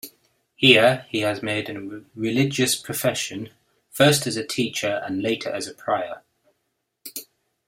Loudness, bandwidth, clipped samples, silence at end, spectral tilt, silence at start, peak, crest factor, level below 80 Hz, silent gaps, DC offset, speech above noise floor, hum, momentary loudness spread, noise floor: -21 LUFS; 16 kHz; under 0.1%; 0.45 s; -3.5 dB/octave; 0.05 s; 0 dBFS; 24 dB; -62 dBFS; none; under 0.1%; 53 dB; none; 21 LU; -76 dBFS